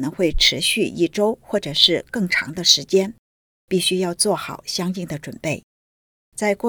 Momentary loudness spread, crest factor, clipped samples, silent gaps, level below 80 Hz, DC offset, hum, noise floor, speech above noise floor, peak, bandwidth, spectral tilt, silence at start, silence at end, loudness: 12 LU; 22 dB; under 0.1%; 3.19-3.68 s, 5.63-6.32 s; -38 dBFS; under 0.1%; none; under -90 dBFS; over 70 dB; 0 dBFS; over 20 kHz; -3 dB/octave; 0 s; 0 s; -19 LUFS